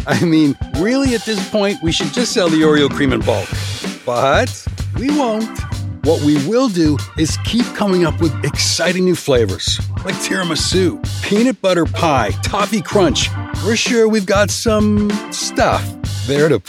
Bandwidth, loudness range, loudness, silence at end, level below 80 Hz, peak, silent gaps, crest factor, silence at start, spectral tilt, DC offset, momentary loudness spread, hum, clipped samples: 16 kHz; 2 LU; -16 LUFS; 0.1 s; -32 dBFS; 0 dBFS; none; 14 dB; 0 s; -4.5 dB/octave; under 0.1%; 7 LU; none; under 0.1%